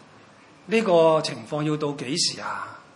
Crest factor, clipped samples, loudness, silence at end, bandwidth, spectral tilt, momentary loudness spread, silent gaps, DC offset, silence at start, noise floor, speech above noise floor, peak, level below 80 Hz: 16 dB; under 0.1%; -23 LUFS; 0.15 s; 11 kHz; -4 dB/octave; 13 LU; none; under 0.1%; 0.65 s; -51 dBFS; 28 dB; -8 dBFS; -74 dBFS